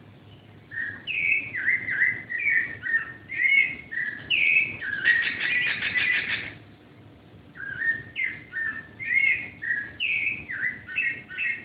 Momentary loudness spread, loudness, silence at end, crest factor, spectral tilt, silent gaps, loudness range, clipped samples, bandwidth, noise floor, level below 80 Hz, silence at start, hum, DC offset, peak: 11 LU; -24 LUFS; 0 s; 18 dB; -5 dB/octave; none; 5 LU; under 0.1%; 5.2 kHz; -50 dBFS; -62 dBFS; 0 s; none; under 0.1%; -8 dBFS